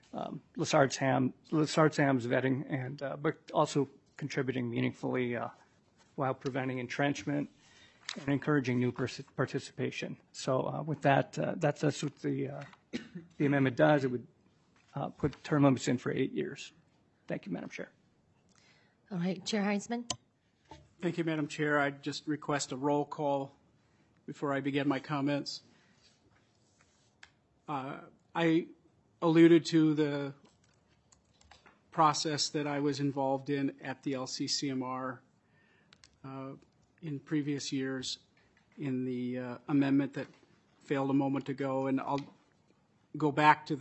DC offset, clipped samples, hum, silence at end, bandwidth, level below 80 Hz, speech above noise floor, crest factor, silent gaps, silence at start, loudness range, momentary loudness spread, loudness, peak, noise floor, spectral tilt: under 0.1%; under 0.1%; none; 0 s; 8.2 kHz; -74 dBFS; 37 dB; 24 dB; none; 0.15 s; 9 LU; 16 LU; -32 LUFS; -10 dBFS; -69 dBFS; -5.5 dB/octave